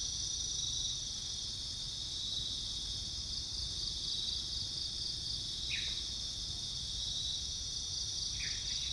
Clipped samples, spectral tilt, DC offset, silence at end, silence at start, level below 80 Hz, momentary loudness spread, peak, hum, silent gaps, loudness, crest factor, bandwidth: under 0.1%; -0.5 dB/octave; under 0.1%; 0 s; 0 s; -52 dBFS; 3 LU; -24 dBFS; none; none; -36 LUFS; 16 dB; 10.5 kHz